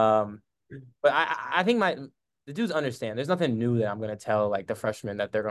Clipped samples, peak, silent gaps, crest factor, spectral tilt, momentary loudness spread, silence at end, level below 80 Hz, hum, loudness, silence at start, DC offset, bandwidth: under 0.1%; -8 dBFS; none; 20 dB; -6 dB/octave; 12 LU; 0 s; -64 dBFS; none; -27 LUFS; 0 s; under 0.1%; 12.5 kHz